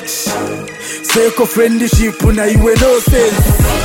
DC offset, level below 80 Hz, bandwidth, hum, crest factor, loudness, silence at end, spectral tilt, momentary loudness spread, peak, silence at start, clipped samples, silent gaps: under 0.1%; -18 dBFS; 17 kHz; none; 12 dB; -12 LUFS; 0 s; -5 dB/octave; 10 LU; 0 dBFS; 0 s; under 0.1%; none